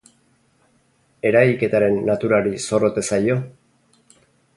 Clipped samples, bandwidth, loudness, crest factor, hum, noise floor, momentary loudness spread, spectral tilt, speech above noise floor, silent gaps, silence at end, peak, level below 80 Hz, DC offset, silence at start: under 0.1%; 11.5 kHz; -19 LUFS; 20 dB; none; -61 dBFS; 7 LU; -6 dB/octave; 43 dB; none; 1.05 s; 0 dBFS; -56 dBFS; under 0.1%; 1.25 s